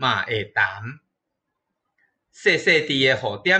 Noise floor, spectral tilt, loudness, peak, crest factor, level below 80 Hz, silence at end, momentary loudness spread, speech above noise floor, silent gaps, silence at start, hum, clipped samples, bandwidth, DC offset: -80 dBFS; -4 dB/octave; -20 LUFS; -4 dBFS; 18 dB; -62 dBFS; 0 s; 8 LU; 59 dB; none; 0 s; none; under 0.1%; 8.8 kHz; under 0.1%